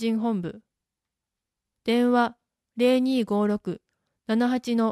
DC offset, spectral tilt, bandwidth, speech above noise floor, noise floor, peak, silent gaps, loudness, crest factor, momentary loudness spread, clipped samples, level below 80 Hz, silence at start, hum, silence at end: under 0.1%; -6.5 dB/octave; 13.5 kHz; 63 dB; -87 dBFS; -10 dBFS; none; -24 LUFS; 16 dB; 15 LU; under 0.1%; -68 dBFS; 0 s; none; 0 s